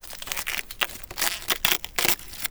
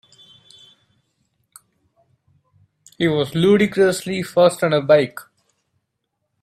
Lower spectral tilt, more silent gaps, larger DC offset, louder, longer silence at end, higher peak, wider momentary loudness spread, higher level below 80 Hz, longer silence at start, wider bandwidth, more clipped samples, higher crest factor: second, 0 dB/octave vs -5.5 dB/octave; neither; neither; second, -25 LUFS vs -17 LUFS; second, 0 s vs 1.2 s; about the same, -2 dBFS vs -2 dBFS; about the same, 7 LU vs 8 LU; first, -48 dBFS vs -60 dBFS; second, 0.05 s vs 3 s; first, over 20 kHz vs 14.5 kHz; neither; first, 26 dB vs 20 dB